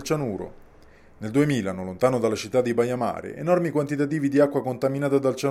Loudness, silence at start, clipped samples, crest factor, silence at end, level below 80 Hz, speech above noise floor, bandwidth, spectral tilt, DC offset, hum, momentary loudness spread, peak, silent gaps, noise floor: -24 LUFS; 0 s; under 0.1%; 18 dB; 0 s; -56 dBFS; 27 dB; 15 kHz; -6.5 dB/octave; under 0.1%; none; 9 LU; -6 dBFS; none; -50 dBFS